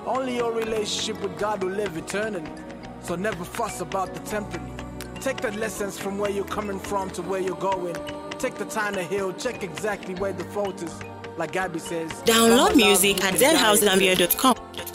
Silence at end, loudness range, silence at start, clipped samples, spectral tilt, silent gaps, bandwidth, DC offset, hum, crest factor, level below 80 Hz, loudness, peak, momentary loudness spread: 0 s; 11 LU; 0 s; under 0.1%; -3 dB/octave; none; 16 kHz; under 0.1%; none; 20 dB; -50 dBFS; -23 LUFS; -4 dBFS; 17 LU